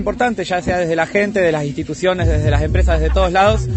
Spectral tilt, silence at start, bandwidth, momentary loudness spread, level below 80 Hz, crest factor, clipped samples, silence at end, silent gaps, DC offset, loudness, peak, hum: -6.5 dB/octave; 0 s; 8.6 kHz; 5 LU; -22 dBFS; 14 dB; under 0.1%; 0 s; none; under 0.1%; -16 LUFS; -2 dBFS; none